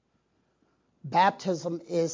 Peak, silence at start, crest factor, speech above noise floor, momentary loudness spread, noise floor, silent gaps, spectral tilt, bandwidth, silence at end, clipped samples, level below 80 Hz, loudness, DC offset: -10 dBFS; 1.05 s; 20 dB; 45 dB; 9 LU; -72 dBFS; none; -5 dB/octave; 7.6 kHz; 0 s; under 0.1%; -78 dBFS; -27 LUFS; under 0.1%